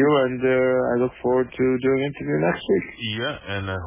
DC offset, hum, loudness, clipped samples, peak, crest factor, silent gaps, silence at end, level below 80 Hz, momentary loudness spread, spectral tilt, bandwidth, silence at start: under 0.1%; none; -22 LUFS; under 0.1%; -8 dBFS; 14 dB; none; 0 s; -48 dBFS; 8 LU; -10.5 dB/octave; 3.8 kHz; 0 s